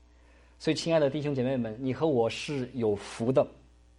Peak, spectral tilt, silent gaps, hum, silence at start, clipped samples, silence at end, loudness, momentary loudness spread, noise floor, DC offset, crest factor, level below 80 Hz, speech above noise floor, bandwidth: -12 dBFS; -6 dB/octave; none; none; 0.6 s; under 0.1%; 0.45 s; -29 LUFS; 7 LU; -57 dBFS; under 0.1%; 18 dB; -58 dBFS; 29 dB; 11.5 kHz